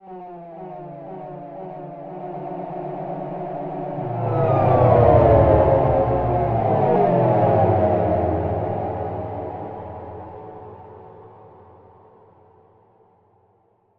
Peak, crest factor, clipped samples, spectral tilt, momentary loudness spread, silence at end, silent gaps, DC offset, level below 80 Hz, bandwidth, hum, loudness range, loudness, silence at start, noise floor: 0 dBFS; 20 dB; under 0.1%; -11.5 dB/octave; 22 LU; 2.5 s; none; under 0.1%; -38 dBFS; 4.7 kHz; none; 17 LU; -19 LUFS; 0.05 s; -61 dBFS